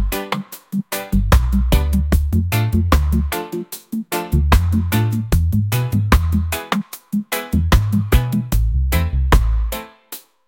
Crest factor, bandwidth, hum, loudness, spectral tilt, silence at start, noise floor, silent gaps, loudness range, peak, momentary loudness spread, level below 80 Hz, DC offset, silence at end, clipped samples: 16 dB; 17 kHz; none; -19 LUFS; -6 dB/octave; 0 s; -38 dBFS; none; 1 LU; 0 dBFS; 10 LU; -20 dBFS; under 0.1%; 0.3 s; under 0.1%